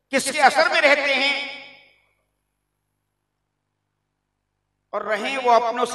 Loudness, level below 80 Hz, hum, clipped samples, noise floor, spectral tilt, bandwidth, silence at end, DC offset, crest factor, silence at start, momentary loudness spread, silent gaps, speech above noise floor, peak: -18 LUFS; -72 dBFS; 50 Hz at -75 dBFS; under 0.1%; -77 dBFS; -1 dB/octave; 12 kHz; 0 s; under 0.1%; 24 dB; 0.1 s; 15 LU; none; 57 dB; 0 dBFS